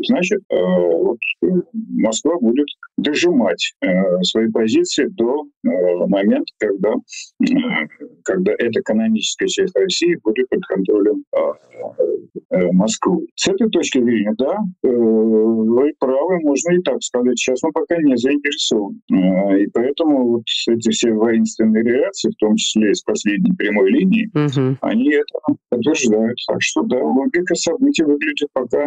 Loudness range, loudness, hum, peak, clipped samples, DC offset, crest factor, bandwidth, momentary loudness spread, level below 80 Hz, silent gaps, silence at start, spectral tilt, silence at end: 2 LU; -17 LUFS; none; -6 dBFS; under 0.1%; under 0.1%; 10 dB; 9.2 kHz; 5 LU; -60 dBFS; 0.45-0.50 s, 5.57-5.61 s, 11.27-11.32 s, 12.45-12.49 s, 13.31-13.36 s, 19.02-19.08 s; 0 s; -5 dB/octave; 0 s